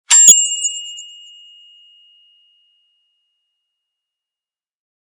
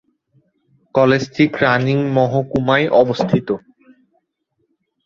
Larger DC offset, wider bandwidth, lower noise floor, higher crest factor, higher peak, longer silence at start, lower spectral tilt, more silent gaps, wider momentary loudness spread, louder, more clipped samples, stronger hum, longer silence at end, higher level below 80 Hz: neither; first, 12 kHz vs 7.4 kHz; first, under -90 dBFS vs -70 dBFS; about the same, 18 dB vs 18 dB; about the same, 0 dBFS vs 0 dBFS; second, 0.1 s vs 0.95 s; second, 3.5 dB/octave vs -7 dB/octave; neither; first, 25 LU vs 6 LU; first, -8 LUFS vs -16 LUFS; first, 0.6% vs under 0.1%; neither; first, 4.1 s vs 1.45 s; second, -62 dBFS vs -52 dBFS